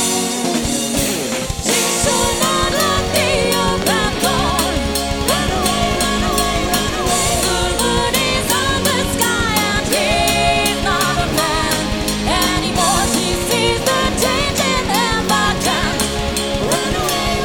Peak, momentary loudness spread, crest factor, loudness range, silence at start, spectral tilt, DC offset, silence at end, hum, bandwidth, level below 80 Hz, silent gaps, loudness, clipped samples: 0 dBFS; 3 LU; 16 dB; 1 LU; 0 s; -3 dB/octave; 0.5%; 0 s; none; 19 kHz; -28 dBFS; none; -16 LUFS; under 0.1%